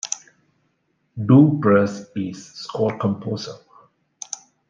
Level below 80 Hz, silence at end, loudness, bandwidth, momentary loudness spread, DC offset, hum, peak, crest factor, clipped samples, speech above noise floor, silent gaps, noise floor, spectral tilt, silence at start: -66 dBFS; 1.15 s; -20 LUFS; 9.4 kHz; 20 LU; under 0.1%; none; -2 dBFS; 18 dB; under 0.1%; 50 dB; none; -68 dBFS; -6.5 dB/octave; 0.05 s